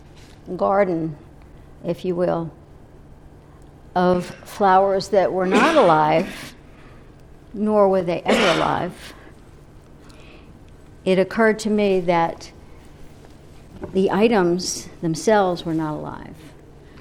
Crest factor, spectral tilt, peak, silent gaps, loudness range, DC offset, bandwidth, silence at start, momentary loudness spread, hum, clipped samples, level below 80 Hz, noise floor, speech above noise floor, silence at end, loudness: 18 dB; -5.5 dB/octave; -2 dBFS; none; 7 LU; under 0.1%; 15 kHz; 0.2 s; 18 LU; none; under 0.1%; -48 dBFS; -45 dBFS; 26 dB; 0 s; -19 LUFS